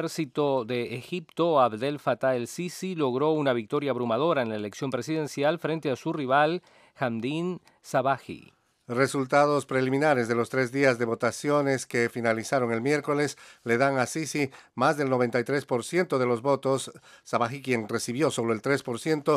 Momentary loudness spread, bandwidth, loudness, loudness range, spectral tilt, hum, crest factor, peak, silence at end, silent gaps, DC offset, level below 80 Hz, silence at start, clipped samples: 8 LU; 15.5 kHz; -27 LUFS; 3 LU; -5.5 dB/octave; none; 20 dB; -8 dBFS; 0 s; none; under 0.1%; -76 dBFS; 0 s; under 0.1%